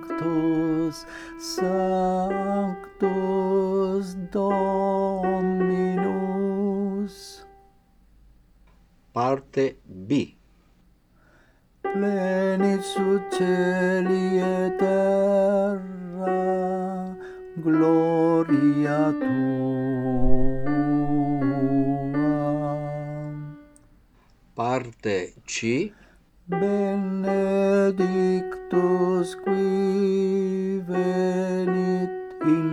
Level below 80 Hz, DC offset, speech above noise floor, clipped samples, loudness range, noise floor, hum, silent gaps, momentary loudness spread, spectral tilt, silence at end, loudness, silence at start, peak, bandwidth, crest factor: -42 dBFS; under 0.1%; 36 dB; under 0.1%; 7 LU; -59 dBFS; none; none; 10 LU; -7 dB/octave; 0 s; -24 LUFS; 0 s; -6 dBFS; 12.5 kHz; 18 dB